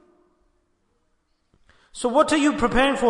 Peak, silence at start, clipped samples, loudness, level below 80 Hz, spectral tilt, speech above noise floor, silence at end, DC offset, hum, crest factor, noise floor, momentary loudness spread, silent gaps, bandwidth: -6 dBFS; 1.95 s; under 0.1%; -20 LUFS; -42 dBFS; -4 dB/octave; 49 dB; 0 s; under 0.1%; none; 18 dB; -68 dBFS; 10 LU; none; 11 kHz